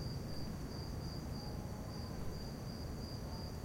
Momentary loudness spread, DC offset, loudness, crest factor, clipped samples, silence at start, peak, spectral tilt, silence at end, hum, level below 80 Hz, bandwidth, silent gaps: 1 LU; under 0.1%; -45 LUFS; 12 dB; under 0.1%; 0 s; -32 dBFS; -6 dB/octave; 0 s; none; -50 dBFS; 16.5 kHz; none